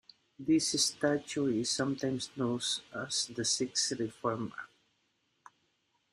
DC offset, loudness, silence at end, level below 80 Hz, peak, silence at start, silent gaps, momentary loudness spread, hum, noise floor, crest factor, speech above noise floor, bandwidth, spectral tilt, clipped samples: under 0.1%; -32 LUFS; 1.45 s; -72 dBFS; -16 dBFS; 0.4 s; none; 9 LU; none; -77 dBFS; 18 dB; 44 dB; 15 kHz; -3 dB/octave; under 0.1%